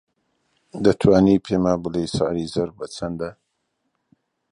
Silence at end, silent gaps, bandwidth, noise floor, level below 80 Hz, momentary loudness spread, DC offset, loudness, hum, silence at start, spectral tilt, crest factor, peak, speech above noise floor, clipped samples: 1.2 s; none; 11 kHz; -74 dBFS; -46 dBFS; 15 LU; under 0.1%; -21 LUFS; none; 0.75 s; -7 dB/octave; 20 dB; -2 dBFS; 54 dB; under 0.1%